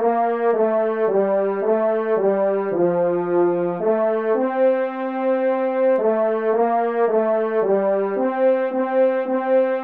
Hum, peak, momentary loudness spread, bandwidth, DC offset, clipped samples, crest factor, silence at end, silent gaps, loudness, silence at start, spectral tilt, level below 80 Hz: none; -8 dBFS; 2 LU; 4.2 kHz; 0.2%; under 0.1%; 10 dB; 0 s; none; -20 LUFS; 0 s; -10.5 dB/octave; -72 dBFS